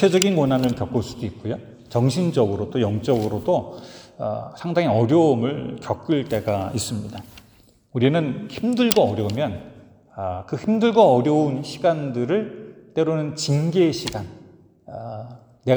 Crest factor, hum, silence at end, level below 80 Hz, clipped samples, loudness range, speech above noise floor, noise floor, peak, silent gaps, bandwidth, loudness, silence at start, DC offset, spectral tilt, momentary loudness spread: 22 dB; none; 0 s; -54 dBFS; under 0.1%; 4 LU; 33 dB; -54 dBFS; 0 dBFS; none; over 20 kHz; -22 LUFS; 0 s; under 0.1%; -6 dB/octave; 17 LU